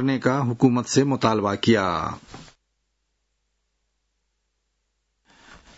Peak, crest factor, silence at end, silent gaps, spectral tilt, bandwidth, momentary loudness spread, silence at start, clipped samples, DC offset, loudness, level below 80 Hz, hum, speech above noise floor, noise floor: -6 dBFS; 20 dB; 0.25 s; none; -5.5 dB/octave; 8 kHz; 8 LU; 0 s; under 0.1%; under 0.1%; -21 LUFS; -58 dBFS; none; 53 dB; -74 dBFS